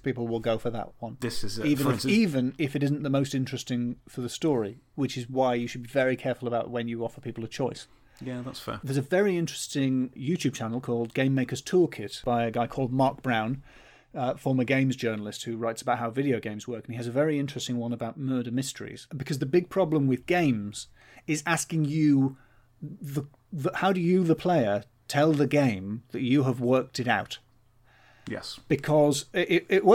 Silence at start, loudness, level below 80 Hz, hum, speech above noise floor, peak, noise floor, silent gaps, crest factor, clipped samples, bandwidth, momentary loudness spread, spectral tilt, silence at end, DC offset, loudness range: 0.05 s; -28 LUFS; -58 dBFS; none; 33 dB; -8 dBFS; -60 dBFS; none; 20 dB; under 0.1%; 17 kHz; 13 LU; -6 dB/octave; 0 s; under 0.1%; 4 LU